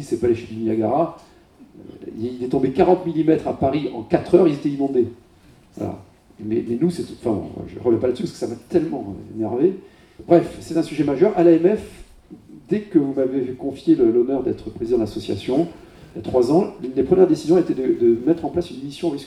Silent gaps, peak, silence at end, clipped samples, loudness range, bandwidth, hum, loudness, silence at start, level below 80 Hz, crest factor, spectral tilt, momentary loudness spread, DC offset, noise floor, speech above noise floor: none; 0 dBFS; 0 s; under 0.1%; 4 LU; 11 kHz; none; -20 LUFS; 0 s; -50 dBFS; 20 dB; -8 dB/octave; 14 LU; under 0.1%; -51 dBFS; 31 dB